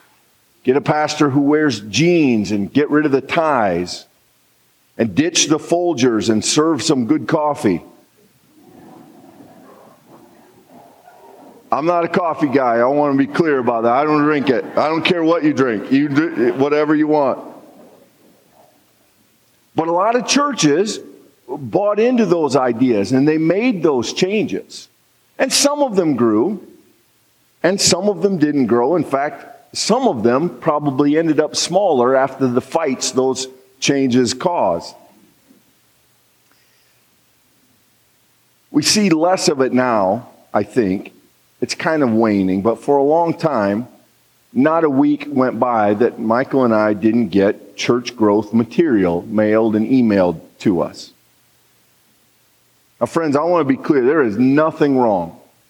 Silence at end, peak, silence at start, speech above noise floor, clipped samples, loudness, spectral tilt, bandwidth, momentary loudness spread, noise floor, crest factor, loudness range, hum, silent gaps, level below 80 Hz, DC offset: 0.35 s; -2 dBFS; 0.65 s; 42 dB; under 0.1%; -16 LUFS; -4.5 dB/octave; 16 kHz; 7 LU; -57 dBFS; 16 dB; 6 LU; none; none; -64 dBFS; under 0.1%